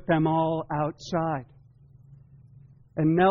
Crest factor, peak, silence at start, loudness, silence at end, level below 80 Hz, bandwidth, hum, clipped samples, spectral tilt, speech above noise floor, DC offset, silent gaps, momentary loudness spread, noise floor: 16 dB; -12 dBFS; 0 s; -27 LUFS; 0 s; -56 dBFS; 7 kHz; none; under 0.1%; -6.5 dB/octave; 30 dB; under 0.1%; none; 9 LU; -54 dBFS